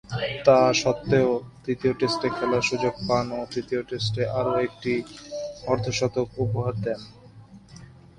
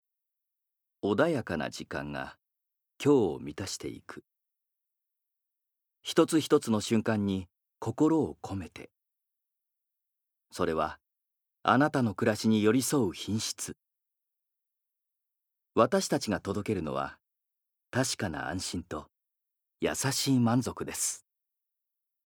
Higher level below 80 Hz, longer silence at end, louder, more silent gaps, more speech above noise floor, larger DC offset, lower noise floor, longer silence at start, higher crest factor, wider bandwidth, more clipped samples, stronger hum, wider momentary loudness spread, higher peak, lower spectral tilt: first, -52 dBFS vs -66 dBFS; second, 0.35 s vs 1.1 s; first, -25 LUFS vs -30 LUFS; neither; second, 24 dB vs 55 dB; neither; second, -48 dBFS vs -84 dBFS; second, 0.1 s vs 1.05 s; about the same, 22 dB vs 24 dB; second, 11 kHz vs over 20 kHz; neither; neither; second, 11 LU vs 14 LU; first, -4 dBFS vs -8 dBFS; about the same, -5.5 dB/octave vs -5 dB/octave